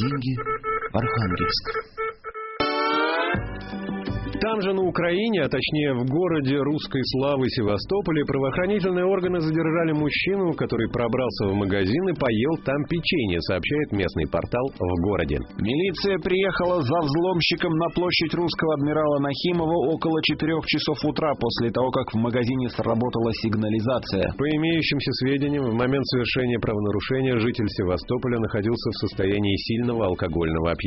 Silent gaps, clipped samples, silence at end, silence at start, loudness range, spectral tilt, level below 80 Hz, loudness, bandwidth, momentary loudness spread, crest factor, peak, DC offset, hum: none; under 0.1%; 0 s; 0 s; 2 LU; -4.5 dB/octave; -44 dBFS; -24 LUFS; 6 kHz; 4 LU; 16 dB; -8 dBFS; under 0.1%; none